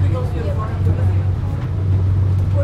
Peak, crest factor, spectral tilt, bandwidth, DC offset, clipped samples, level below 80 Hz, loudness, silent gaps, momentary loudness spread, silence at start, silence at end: -6 dBFS; 10 dB; -9.5 dB/octave; 4.7 kHz; under 0.1%; under 0.1%; -30 dBFS; -19 LUFS; none; 4 LU; 0 s; 0 s